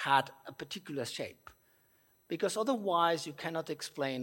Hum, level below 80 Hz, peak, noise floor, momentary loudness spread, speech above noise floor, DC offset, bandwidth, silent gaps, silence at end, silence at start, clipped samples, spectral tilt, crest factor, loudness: none; -78 dBFS; -14 dBFS; -69 dBFS; 14 LU; 35 dB; under 0.1%; 16.5 kHz; none; 0 s; 0 s; under 0.1%; -4 dB/octave; 22 dB; -35 LUFS